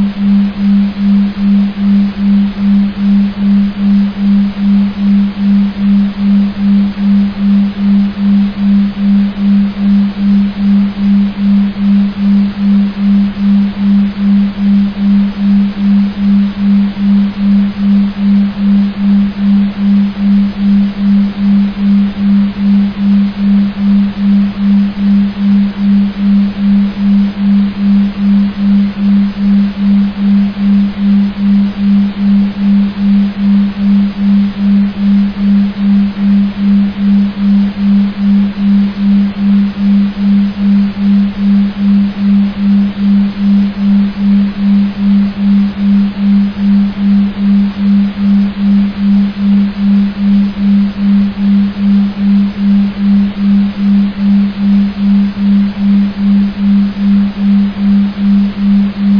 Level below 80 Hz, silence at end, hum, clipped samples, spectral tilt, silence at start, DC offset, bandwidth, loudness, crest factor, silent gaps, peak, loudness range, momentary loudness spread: -34 dBFS; 0 s; none; under 0.1%; -10 dB/octave; 0 s; under 0.1%; 5.4 kHz; -10 LUFS; 8 dB; none; -2 dBFS; 0 LU; 0 LU